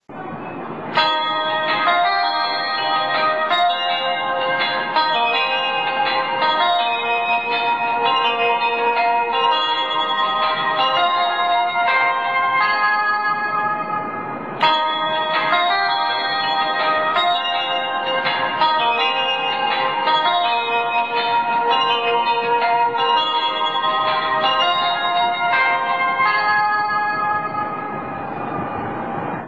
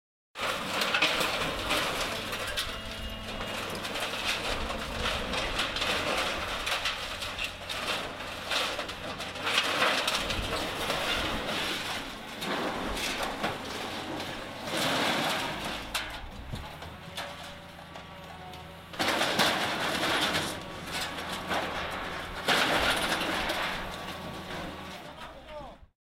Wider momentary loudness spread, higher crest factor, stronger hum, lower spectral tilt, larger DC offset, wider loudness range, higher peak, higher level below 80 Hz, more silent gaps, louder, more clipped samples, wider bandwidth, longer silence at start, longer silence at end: second, 5 LU vs 16 LU; second, 14 dB vs 22 dB; neither; first, -4.5 dB/octave vs -2.5 dB/octave; first, 0.4% vs under 0.1%; second, 1 LU vs 4 LU; first, -4 dBFS vs -12 dBFS; second, -66 dBFS vs -48 dBFS; neither; first, -18 LUFS vs -30 LUFS; neither; second, 8 kHz vs 16 kHz; second, 0.1 s vs 0.35 s; second, 0 s vs 0.35 s